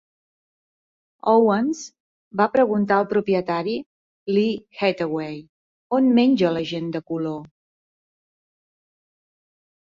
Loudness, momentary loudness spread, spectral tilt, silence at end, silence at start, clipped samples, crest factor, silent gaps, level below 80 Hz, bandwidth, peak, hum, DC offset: -21 LUFS; 14 LU; -6.5 dB/octave; 2.45 s; 1.25 s; under 0.1%; 18 dB; 2.00-2.31 s, 3.86-4.26 s, 5.49-5.90 s; -66 dBFS; 7.6 kHz; -4 dBFS; none; under 0.1%